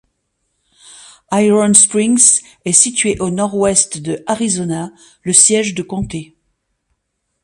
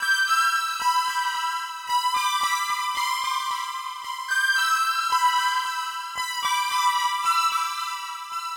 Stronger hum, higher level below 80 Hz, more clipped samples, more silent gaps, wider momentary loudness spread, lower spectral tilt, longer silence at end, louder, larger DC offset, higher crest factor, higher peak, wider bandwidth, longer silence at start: neither; first, -48 dBFS vs -72 dBFS; first, 0.1% vs under 0.1%; neither; first, 15 LU vs 10 LU; first, -3 dB/octave vs 4 dB/octave; first, 1.2 s vs 0 s; first, -12 LUFS vs -23 LUFS; neither; about the same, 16 dB vs 14 dB; first, 0 dBFS vs -10 dBFS; second, 16 kHz vs over 20 kHz; first, 1.3 s vs 0 s